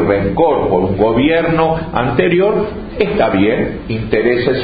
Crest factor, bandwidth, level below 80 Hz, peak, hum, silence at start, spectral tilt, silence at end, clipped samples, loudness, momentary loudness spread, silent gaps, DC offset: 14 dB; 5 kHz; -34 dBFS; 0 dBFS; none; 0 s; -10.5 dB/octave; 0 s; under 0.1%; -14 LUFS; 6 LU; none; under 0.1%